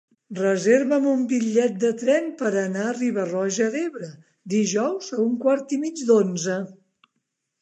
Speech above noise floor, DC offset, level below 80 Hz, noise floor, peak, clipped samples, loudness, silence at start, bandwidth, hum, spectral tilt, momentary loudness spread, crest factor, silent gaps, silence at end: 55 dB; under 0.1%; -78 dBFS; -77 dBFS; -6 dBFS; under 0.1%; -23 LUFS; 0.3 s; 9.4 kHz; none; -5 dB/octave; 9 LU; 16 dB; none; 0.9 s